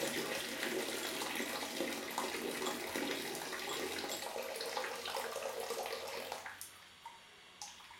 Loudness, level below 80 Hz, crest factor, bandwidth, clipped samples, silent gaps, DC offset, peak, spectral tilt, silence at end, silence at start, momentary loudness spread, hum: -40 LUFS; -78 dBFS; 22 dB; 17 kHz; under 0.1%; none; under 0.1%; -20 dBFS; -1.5 dB/octave; 0 s; 0 s; 12 LU; none